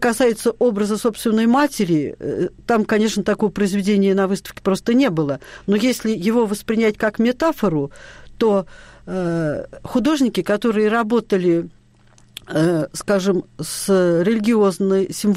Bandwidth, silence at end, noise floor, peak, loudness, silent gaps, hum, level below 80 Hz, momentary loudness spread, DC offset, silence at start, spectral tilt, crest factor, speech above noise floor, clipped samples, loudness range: 16 kHz; 0 s; -51 dBFS; -8 dBFS; -19 LUFS; none; none; -50 dBFS; 8 LU; under 0.1%; 0 s; -5.5 dB/octave; 10 dB; 33 dB; under 0.1%; 2 LU